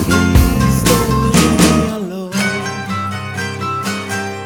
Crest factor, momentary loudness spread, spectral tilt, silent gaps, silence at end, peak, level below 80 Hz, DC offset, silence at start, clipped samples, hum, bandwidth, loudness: 14 dB; 10 LU; -5 dB/octave; none; 0 s; 0 dBFS; -24 dBFS; under 0.1%; 0 s; under 0.1%; none; over 20 kHz; -15 LUFS